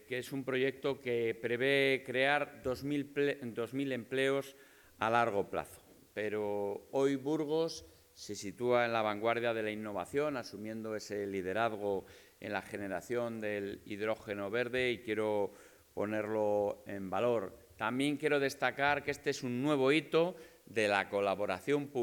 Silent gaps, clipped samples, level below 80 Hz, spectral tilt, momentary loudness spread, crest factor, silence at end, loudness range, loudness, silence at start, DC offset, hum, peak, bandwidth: none; under 0.1%; -72 dBFS; -5 dB/octave; 10 LU; 20 dB; 0 s; 5 LU; -35 LUFS; 0.1 s; under 0.1%; none; -14 dBFS; 19 kHz